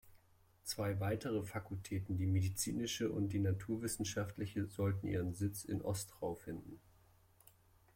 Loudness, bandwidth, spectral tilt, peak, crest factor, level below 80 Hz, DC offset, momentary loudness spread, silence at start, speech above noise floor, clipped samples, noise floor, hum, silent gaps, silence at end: -40 LUFS; 16.5 kHz; -5.5 dB/octave; -26 dBFS; 14 dB; -64 dBFS; under 0.1%; 8 LU; 0.05 s; 30 dB; under 0.1%; -69 dBFS; none; none; 1.2 s